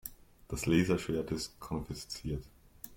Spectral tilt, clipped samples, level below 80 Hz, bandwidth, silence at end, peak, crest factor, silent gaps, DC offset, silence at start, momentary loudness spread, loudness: -5.5 dB/octave; under 0.1%; -52 dBFS; 16.5 kHz; 0 s; -14 dBFS; 20 dB; none; under 0.1%; 0.05 s; 14 LU; -35 LUFS